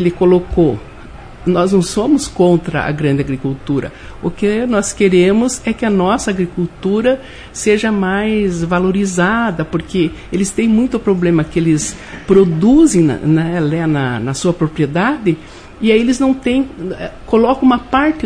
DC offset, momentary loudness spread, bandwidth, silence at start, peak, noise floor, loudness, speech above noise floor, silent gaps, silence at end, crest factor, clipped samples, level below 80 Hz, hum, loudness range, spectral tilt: under 0.1%; 9 LU; 10.5 kHz; 0 s; 0 dBFS; -33 dBFS; -14 LUFS; 19 dB; none; 0 s; 14 dB; under 0.1%; -36 dBFS; none; 3 LU; -6 dB/octave